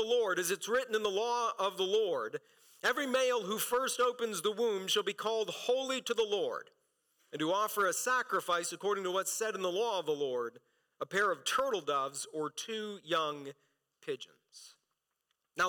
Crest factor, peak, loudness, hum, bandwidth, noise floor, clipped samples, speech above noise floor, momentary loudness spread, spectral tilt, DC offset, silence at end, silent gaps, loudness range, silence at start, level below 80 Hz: 12 dB; -22 dBFS; -33 LUFS; none; 19 kHz; -85 dBFS; under 0.1%; 51 dB; 11 LU; -2 dB/octave; under 0.1%; 0 s; none; 4 LU; 0 s; -82 dBFS